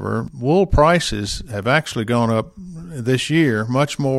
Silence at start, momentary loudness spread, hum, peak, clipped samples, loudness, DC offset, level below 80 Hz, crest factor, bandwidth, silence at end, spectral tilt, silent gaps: 0 s; 11 LU; none; 0 dBFS; under 0.1%; -18 LUFS; under 0.1%; -32 dBFS; 18 dB; 14.5 kHz; 0 s; -5.5 dB/octave; none